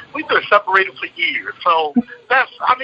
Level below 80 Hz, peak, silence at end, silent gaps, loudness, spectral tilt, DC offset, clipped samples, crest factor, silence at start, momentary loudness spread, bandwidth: -62 dBFS; 0 dBFS; 0 s; none; -16 LUFS; -5 dB/octave; under 0.1%; under 0.1%; 18 dB; 0 s; 6 LU; 8 kHz